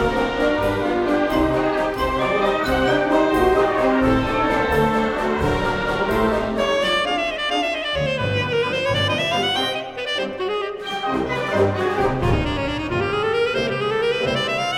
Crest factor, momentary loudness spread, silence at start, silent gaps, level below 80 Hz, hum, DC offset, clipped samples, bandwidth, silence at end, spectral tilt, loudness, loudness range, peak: 14 dB; 5 LU; 0 s; none; -36 dBFS; none; under 0.1%; under 0.1%; 16.5 kHz; 0 s; -5.5 dB/octave; -20 LUFS; 3 LU; -6 dBFS